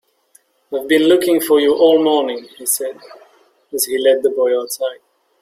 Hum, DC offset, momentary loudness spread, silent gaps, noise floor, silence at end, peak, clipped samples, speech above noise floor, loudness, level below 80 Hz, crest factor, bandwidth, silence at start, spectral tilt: none; under 0.1%; 13 LU; none; -55 dBFS; 0.45 s; -2 dBFS; under 0.1%; 40 dB; -15 LUFS; -62 dBFS; 16 dB; 16.5 kHz; 0.7 s; -2.5 dB/octave